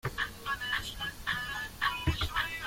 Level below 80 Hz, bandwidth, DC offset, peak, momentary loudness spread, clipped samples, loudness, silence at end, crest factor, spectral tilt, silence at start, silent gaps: -46 dBFS; 16.5 kHz; under 0.1%; -16 dBFS; 5 LU; under 0.1%; -33 LUFS; 0 s; 18 dB; -3.5 dB/octave; 0.05 s; none